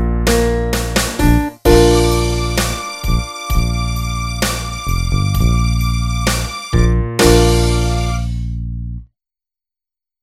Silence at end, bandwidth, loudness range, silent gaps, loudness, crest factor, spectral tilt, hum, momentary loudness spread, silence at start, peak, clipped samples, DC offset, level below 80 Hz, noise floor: 1.2 s; 16 kHz; 3 LU; none; -16 LUFS; 16 dB; -5 dB/octave; none; 10 LU; 0 s; 0 dBFS; under 0.1%; under 0.1%; -20 dBFS; -89 dBFS